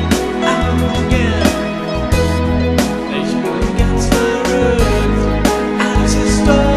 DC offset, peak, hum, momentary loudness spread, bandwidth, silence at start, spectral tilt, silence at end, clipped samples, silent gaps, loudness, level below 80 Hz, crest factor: under 0.1%; 0 dBFS; none; 4 LU; 14 kHz; 0 s; -5.5 dB/octave; 0 s; under 0.1%; none; -15 LUFS; -20 dBFS; 14 dB